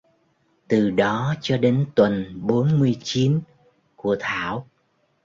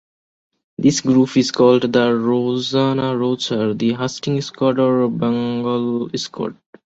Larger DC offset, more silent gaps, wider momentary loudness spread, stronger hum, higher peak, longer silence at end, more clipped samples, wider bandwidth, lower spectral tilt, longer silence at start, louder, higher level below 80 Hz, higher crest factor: neither; neither; about the same, 7 LU vs 8 LU; neither; about the same, -4 dBFS vs -2 dBFS; first, 0.6 s vs 0.35 s; neither; about the same, 7.6 kHz vs 8 kHz; first, -7 dB/octave vs -5.5 dB/octave; about the same, 0.7 s vs 0.8 s; second, -22 LUFS vs -18 LUFS; about the same, -56 dBFS vs -58 dBFS; about the same, 18 dB vs 16 dB